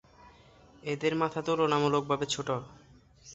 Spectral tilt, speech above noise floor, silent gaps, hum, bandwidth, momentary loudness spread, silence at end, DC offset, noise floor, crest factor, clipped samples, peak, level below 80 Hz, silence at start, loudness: -5 dB/octave; 28 dB; none; none; 8.2 kHz; 11 LU; 0 s; under 0.1%; -57 dBFS; 20 dB; under 0.1%; -12 dBFS; -64 dBFS; 0.25 s; -30 LUFS